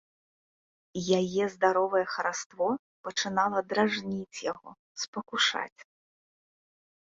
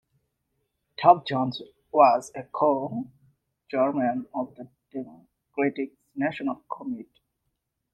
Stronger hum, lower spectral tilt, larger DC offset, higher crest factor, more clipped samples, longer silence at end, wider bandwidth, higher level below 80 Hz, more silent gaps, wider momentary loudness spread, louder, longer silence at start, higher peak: neither; second, -3.5 dB/octave vs -6.5 dB/octave; neither; about the same, 22 dB vs 24 dB; neither; first, 1.2 s vs 0.9 s; second, 7.8 kHz vs 9.4 kHz; about the same, -72 dBFS vs -72 dBFS; first, 2.46-2.50 s, 2.79-3.04 s, 4.79-4.95 s, 5.08-5.13 s, 5.72-5.76 s vs none; second, 10 LU vs 19 LU; second, -29 LUFS vs -25 LUFS; about the same, 0.95 s vs 1 s; second, -10 dBFS vs -2 dBFS